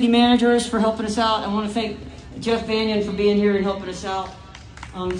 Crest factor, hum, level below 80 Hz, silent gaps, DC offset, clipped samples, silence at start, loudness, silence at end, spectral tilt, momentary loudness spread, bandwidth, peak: 16 dB; none; -44 dBFS; none; under 0.1%; under 0.1%; 0 s; -21 LUFS; 0 s; -5 dB/octave; 20 LU; 10 kHz; -4 dBFS